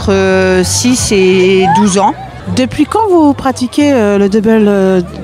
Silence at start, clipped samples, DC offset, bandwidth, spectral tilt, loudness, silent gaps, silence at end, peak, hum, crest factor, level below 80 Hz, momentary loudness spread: 0 s; under 0.1%; under 0.1%; 15 kHz; -5 dB/octave; -9 LUFS; none; 0 s; 0 dBFS; none; 10 dB; -34 dBFS; 6 LU